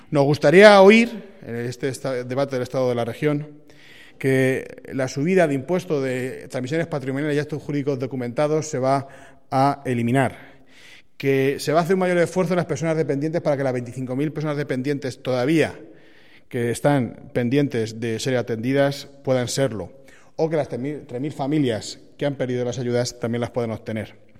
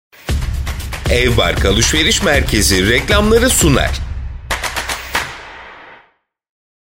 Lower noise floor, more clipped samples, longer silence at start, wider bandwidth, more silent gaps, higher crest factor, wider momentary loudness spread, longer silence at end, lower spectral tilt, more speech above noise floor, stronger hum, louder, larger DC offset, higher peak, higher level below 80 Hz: second, -52 dBFS vs -57 dBFS; neither; second, 0.1 s vs 0.25 s; about the same, 15.5 kHz vs 16.5 kHz; neither; first, 22 dB vs 16 dB; second, 10 LU vs 14 LU; second, 0.3 s vs 1 s; first, -6 dB/octave vs -3.5 dB/octave; second, 31 dB vs 45 dB; neither; second, -21 LUFS vs -14 LUFS; first, 0.4% vs under 0.1%; about the same, 0 dBFS vs 0 dBFS; second, -60 dBFS vs -22 dBFS